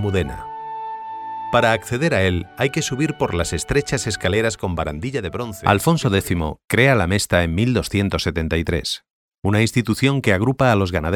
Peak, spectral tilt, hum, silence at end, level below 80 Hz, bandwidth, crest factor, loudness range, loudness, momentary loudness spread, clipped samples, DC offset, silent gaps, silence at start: 0 dBFS; -5 dB/octave; none; 0 s; -38 dBFS; 17.5 kHz; 20 dB; 3 LU; -20 LUFS; 11 LU; under 0.1%; under 0.1%; 9.10-9.29 s; 0 s